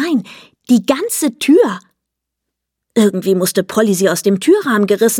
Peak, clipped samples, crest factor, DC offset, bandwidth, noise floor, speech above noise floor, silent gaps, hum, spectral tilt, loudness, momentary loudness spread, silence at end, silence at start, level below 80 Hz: 0 dBFS; under 0.1%; 14 dB; under 0.1%; 17.5 kHz; -78 dBFS; 65 dB; none; none; -4.5 dB/octave; -14 LUFS; 6 LU; 0 s; 0 s; -62 dBFS